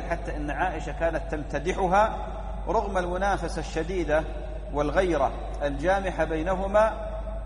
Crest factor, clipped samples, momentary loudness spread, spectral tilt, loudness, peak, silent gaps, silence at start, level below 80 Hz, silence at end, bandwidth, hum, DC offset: 18 dB; under 0.1%; 10 LU; -6 dB/octave; -27 LUFS; -10 dBFS; none; 0 s; -34 dBFS; 0 s; 11 kHz; none; under 0.1%